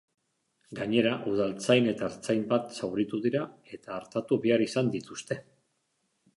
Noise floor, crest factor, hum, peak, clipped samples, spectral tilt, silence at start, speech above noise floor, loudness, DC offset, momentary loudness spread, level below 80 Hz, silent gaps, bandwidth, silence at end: -76 dBFS; 20 dB; none; -10 dBFS; under 0.1%; -5.5 dB/octave; 0.7 s; 48 dB; -29 LUFS; under 0.1%; 13 LU; -68 dBFS; none; 11.5 kHz; 0.95 s